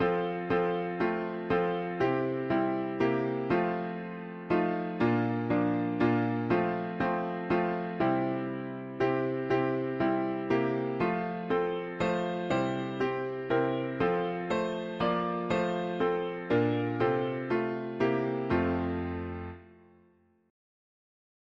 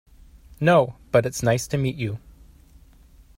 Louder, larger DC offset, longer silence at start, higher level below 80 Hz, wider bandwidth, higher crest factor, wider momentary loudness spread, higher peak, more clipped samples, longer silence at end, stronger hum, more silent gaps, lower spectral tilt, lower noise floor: second, -30 LUFS vs -22 LUFS; neither; second, 0 s vs 0.6 s; second, -58 dBFS vs -48 dBFS; second, 7.4 kHz vs 16 kHz; about the same, 16 dB vs 18 dB; second, 5 LU vs 12 LU; second, -14 dBFS vs -6 dBFS; neither; first, 1.8 s vs 1.2 s; neither; neither; first, -8 dB/octave vs -6 dB/octave; first, -65 dBFS vs -51 dBFS